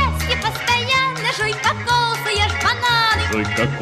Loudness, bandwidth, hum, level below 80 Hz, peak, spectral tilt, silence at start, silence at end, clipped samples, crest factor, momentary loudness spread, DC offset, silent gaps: -18 LUFS; 15.5 kHz; none; -36 dBFS; -6 dBFS; -3.5 dB/octave; 0 s; 0 s; under 0.1%; 12 dB; 4 LU; under 0.1%; none